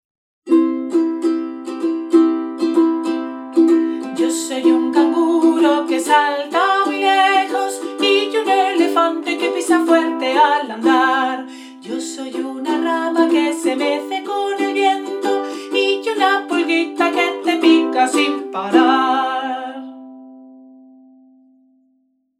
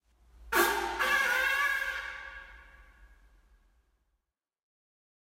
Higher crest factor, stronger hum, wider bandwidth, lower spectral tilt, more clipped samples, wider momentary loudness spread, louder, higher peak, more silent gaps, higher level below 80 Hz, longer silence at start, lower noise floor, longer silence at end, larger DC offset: second, 16 dB vs 22 dB; neither; second, 13.5 kHz vs 16 kHz; about the same, -2.5 dB/octave vs -1.5 dB/octave; neither; second, 9 LU vs 17 LU; first, -17 LUFS vs -28 LUFS; first, 0 dBFS vs -12 dBFS; neither; second, -88 dBFS vs -58 dBFS; about the same, 0.45 s vs 0.4 s; second, -63 dBFS vs -84 dBFS; second, 1.8 s vs 2.3 s; neither